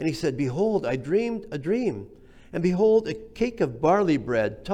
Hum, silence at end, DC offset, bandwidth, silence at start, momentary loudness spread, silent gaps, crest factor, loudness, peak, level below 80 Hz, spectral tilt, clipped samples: none; 0 s; under 0.1%; 10.5 kHz; 0 s; 9 LU; none; 16 dB; -25 LUFS; -8 dBFS; -52 dBFS; -7 dB/octave; under 0.1%